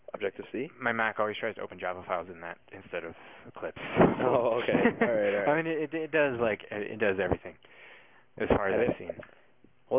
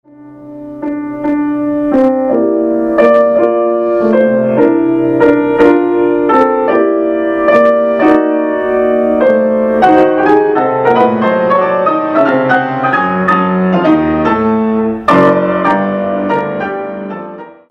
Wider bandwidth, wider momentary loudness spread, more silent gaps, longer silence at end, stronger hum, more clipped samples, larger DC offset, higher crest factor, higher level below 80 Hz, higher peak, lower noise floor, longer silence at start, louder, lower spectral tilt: second, 3.8 kHz vs 7.2 kHz; first, 16 LU vs 9 LU; neither; second, 0 s vs 0.2 s; neither; second, under 0.1% vs 0.2%; neither; first, 18 dB vs 10 dB; second, -54 dBFS vs -44 dBFS; second, -12 dBFS vs 0 dBFS; first, -64 dBFS vs -33 dBFS; about the same, 0.15 s vs 0.2 s; second, -29 LUFS vs -11 LUFS; first, -10 dB/octave vs -8.5 dB/octave